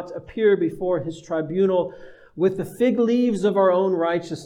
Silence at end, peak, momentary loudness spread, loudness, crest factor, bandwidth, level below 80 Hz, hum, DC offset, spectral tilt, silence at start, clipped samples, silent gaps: 0 s; -8 dBFS; 8 LU; -22 LUFS; 14 dB; 14 kHz; -58 dBFS; none; under 0.1%; -7 dB/octave; 0 s; under 0.1%; none